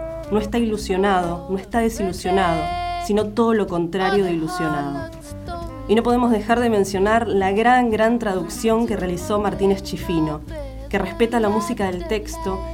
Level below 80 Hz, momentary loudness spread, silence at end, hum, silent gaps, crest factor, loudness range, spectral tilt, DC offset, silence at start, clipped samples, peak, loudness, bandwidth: -36 dBFS; 9 LU; 0 s; none; none; 16 dB; 4 LU; -5.5 dB/octave; under 0.1%; 0 s; under 0.1%; -4 dBFS; -20 LUFS; 16.5 kHz